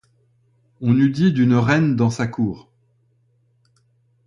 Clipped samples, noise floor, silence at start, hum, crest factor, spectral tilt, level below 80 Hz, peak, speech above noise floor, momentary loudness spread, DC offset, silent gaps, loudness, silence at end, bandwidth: under 0.1%; -62 dBFS; 0.8 s; none; 16 dB; -7.5 dB/octave; -54 dBFS; -4 dBFS; 45 dB; 10 LU; under 0.1%; none; -18 LUFS; 1.7 s; 10.5 kHz